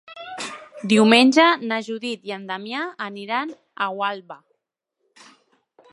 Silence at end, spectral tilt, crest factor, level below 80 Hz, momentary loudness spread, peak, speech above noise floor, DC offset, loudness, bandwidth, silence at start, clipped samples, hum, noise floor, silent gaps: 1.55 s; -4 dB/octave; 22 dB; -76 dBFS; 20 LU; -2 dBFS; 58 dB; under 0.1%; -20 LUFS; 11.5 kHz; 0.1 s; under 0.1%; none; -78 dBFS; none